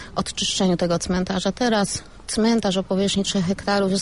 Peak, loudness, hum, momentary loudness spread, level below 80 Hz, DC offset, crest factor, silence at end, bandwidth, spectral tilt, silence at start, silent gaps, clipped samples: -10 dBFS; -22 LUFS; none; 5 LU; -44 dBFS; 0.4%; 12 dB; 0 s; 11.5 kHz; -4.5 dB/octave; 0 s; none; under 0.1%